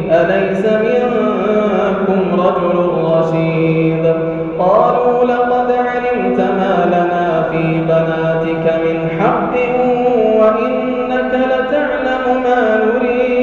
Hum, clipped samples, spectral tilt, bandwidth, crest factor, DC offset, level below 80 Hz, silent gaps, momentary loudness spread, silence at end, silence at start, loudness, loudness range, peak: none; under 0.1%; -8.5 dB/octave; 7 kHz; 12 dB; under 0.1%; -44 dBFS; none; 4 LU; 0 s; 0 s; -14 LUFS; 1 LU; -2 dBFS